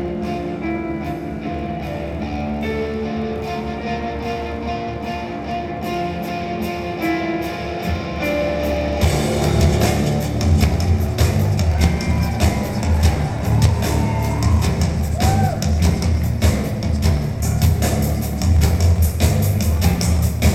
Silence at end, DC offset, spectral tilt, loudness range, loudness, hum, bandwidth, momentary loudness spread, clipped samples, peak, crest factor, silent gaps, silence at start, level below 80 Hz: 0 s; under 0.1%; -6 dB/octave; 7 LU; -20 LUFS; none; 16 kHz; 8 LU; under 0.1%; 0 dBFS; 18 dB; none; 0 s; -24 dBFS